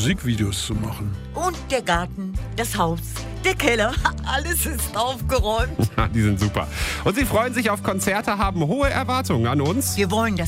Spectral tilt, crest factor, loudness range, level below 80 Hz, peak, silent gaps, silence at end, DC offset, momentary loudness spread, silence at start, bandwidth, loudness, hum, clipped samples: -4.5 dB/octave; 18 dB; 3 LU; -32 dBFS; -4 dBFS; none; 0 s; under 0.1%; 6 LU; 0 s; 16 kHz; -22 LUFS; none; under 0.1%